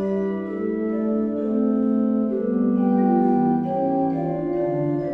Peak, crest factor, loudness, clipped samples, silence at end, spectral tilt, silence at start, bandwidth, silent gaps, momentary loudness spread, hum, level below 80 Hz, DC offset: -8 dBFS; 14 dB; -22 LUFS; under 0.1%; 0 s; -11.5 dB/octave; 0 s; 3.4 kHz; none; 6 LU; none; -56 dBFS; under 0.1%